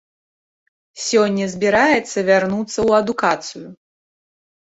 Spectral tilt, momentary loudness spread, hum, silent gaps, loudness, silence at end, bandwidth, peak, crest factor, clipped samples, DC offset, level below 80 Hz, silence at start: -4 dB/octave; 10 LU; none; none; -17 LUFS; 0.95 s; 8.2 kHz; -2 dBFS; 18 dB; under 0.1%; under 0.1%; -54 dBFS; 0.95 s